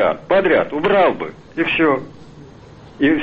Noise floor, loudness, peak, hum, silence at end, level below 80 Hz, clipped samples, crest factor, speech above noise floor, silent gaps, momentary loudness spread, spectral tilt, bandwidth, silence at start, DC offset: -41 dBFS; -17 LUFS; -4 dBFS; none; 0 s; -48 dBFS; under 0.1%; 14 dB; 24 dB; none; 12 LU; -7.5 dB/octave; 7 kHz; 0 s; under 0.1%